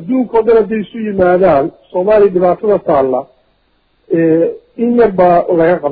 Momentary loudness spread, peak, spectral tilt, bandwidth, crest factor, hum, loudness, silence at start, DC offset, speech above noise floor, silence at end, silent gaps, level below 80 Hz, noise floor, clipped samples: 9 LU; 0 dBFS; -11.5 dB/octave; 4.8 kHz; 12 dB; none; -12 LUFS; 0 s; under 0.1%; 46 dB; 0 s; none; -42 dBFS; -57 dBFS; under 0.1%